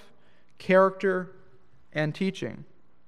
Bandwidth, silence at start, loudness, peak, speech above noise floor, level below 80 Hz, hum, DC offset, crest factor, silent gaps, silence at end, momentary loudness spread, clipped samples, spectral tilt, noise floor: 10.5 kHz; 0.6 s; -26 LUFS; -8 dBFS; 38 dB; -70 dBFS; none; 0.4%; 20 dB; none; 0.45 s; 20 LU; under 0.1%; -7 dB/octave; -63 dBFS